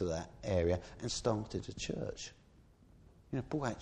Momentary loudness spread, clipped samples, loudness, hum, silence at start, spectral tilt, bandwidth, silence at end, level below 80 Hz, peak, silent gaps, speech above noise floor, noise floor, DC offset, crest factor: 9 LU; under 0.1%; -38 LUFS; none; 0 s; -5.5 dB/octave; 10.5 kHz; 0 s; -54 dBFS; -18 dBFS; none; 26 dB; -63 dBFS; under 0.1%; 20 dB